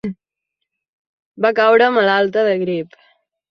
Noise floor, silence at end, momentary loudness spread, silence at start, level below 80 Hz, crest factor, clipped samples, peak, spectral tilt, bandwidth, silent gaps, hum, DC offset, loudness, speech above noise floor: -79 dBFS; 0.65 s; 14 LU; 0.05 s; -64 dBFS; 16 dB; under 0.1%; -2 dBFS; -6.5 dB/octave; 6.4 kHz; 0.88-1.32 s; none; under 0.1%; -15 LUFS; 65 dB